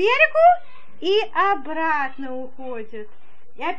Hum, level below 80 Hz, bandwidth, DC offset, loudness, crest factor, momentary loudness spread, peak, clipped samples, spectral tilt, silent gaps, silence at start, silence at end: none; -56 dBFS; 7.6 kHz; 4%; -19 LUFS; 18 dB; 19 LU; -4 dBFS; under 0.1%; -4 dB/octave; none; 0 s; 0 s